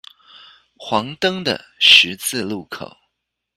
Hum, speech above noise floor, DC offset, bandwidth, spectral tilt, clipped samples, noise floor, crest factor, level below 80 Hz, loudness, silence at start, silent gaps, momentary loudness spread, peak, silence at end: none; 59 dB; under 0.1%; 16 kHz; -2 dB/octave; under 0.1%; -77 dBFS; 20 dB; -62 dBFS; -15 LUFS; 0.8 s; none; 24 LU; 0 dBFS; 0.7 s